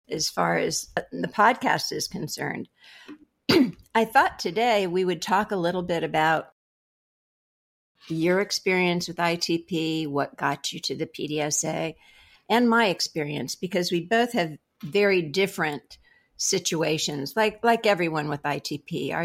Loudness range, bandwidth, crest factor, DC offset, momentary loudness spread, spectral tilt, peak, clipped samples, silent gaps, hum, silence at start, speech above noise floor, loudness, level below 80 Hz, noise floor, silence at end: 3 LU; 16 kHz; 20 dB; under 0.1%; 9 LU; -3.5 dB/octave; -6 dBFS; under 0.1%; 6.52-7.95 s; none; 0.1 s; over 65 dB; -25 LUFS; -62 dBFS; under -90 dBFS; 0 s